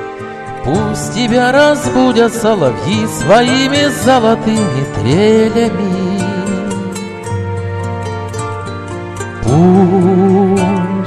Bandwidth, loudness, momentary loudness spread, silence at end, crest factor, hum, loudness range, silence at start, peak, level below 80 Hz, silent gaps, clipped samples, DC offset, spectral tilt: 13.5 kHz; -12 LUFS; 13 LU; 0 s; 12 dB; none; 8 LU; 0 s; 0 dBFS; -38 dBFS; none; under 0.1%; under 0.1%; -5.5 dB/octave